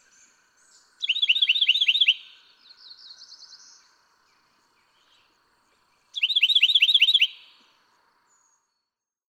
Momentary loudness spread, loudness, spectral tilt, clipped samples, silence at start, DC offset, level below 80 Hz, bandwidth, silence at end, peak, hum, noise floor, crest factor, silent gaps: 11 LU; -18 LUFS; 5.5 dB/octave; under 0.1%; 1 s; under 0.1%; -90 dBFS; 17.5 kHz; 1.95 s; -6 dBFS; none; -85 dBFS; 20 dB; none